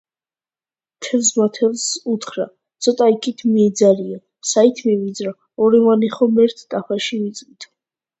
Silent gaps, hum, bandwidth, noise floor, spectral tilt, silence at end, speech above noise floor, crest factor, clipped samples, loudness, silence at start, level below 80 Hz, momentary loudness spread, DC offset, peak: none; none; 8.2 kHz; under -90 dBFS; -4 dB/octave; 0.55 s; over 73 dB; 18 dB; under 0.1%; -17 LUFS; 1 s; -66 dBFS; 13 LU; under 0.1%; 0 dBFS